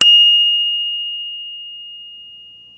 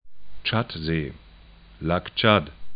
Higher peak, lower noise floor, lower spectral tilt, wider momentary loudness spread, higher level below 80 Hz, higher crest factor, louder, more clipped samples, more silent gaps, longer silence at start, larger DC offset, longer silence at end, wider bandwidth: about the same, 0 dBFS vs -2 dBFS; second, -40 dBFS vs -49 dBFS; second, 2.5 dB/octave vs -10.5 dB/octave; first, 25 LU vs 11 LU; second, -74 dBFS vs -46 dBFS; second, 16 dB vs 24 dB; first, -12 LUFS vs -24 LUFS; neither; neither; about the same, 0 s vs 0.05 s; neither; first, 0.35 s vs 0 s; first, 9 kHz vs 5.2 kHz